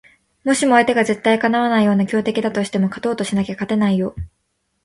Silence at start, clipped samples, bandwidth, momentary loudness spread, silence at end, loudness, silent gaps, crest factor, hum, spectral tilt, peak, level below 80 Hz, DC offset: 0.45 s; under 0.1%; 11.5 kHz; 8 LU; 0.55 s; -18 LUFS; none; 18 dB; none; -5.5 dB/octave; 0 dBFS; -46 dBFS; under 0.1%